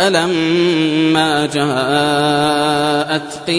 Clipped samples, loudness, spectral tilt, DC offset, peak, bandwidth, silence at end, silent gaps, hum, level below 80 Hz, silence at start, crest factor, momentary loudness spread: under 0.1%; -14 LUFS; -4.5 dB/octave; under 0.1%; 0 dBFS; 11 kHz; 0 s; none; none; -52 dBFS; 0 s; 14 dB; 3 LU